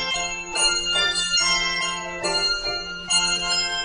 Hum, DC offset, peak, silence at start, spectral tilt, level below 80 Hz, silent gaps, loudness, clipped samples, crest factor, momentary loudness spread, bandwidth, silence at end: none; under 0.1%; -6 dBFS; 0 s; 0 dB/octave; -44 dBFS; none; -21 LUFS; under 0.1%; 16 dB; 7 LU; 12 kHz; 0 s